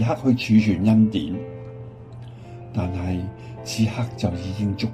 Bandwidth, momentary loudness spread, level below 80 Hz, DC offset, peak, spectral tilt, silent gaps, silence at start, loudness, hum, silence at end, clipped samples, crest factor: 13 kHz; 22 LU; -48 dBFS; under 0.1%; -6 dBFS; -7 dB/octave; none; 0 s; -22 LUFS; none; 0 s; under 0.1%; 16 dB